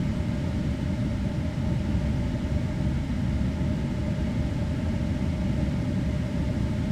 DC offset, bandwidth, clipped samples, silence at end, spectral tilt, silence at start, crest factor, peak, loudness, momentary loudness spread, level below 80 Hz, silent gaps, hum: under 0.1%; 11.5 kHz; under 0.1%; 0 s; -8 dB/octave; 0 s; 12 dB; -14 dBFS; -28 LUFS; 1 LU; -34 dBFS; none; none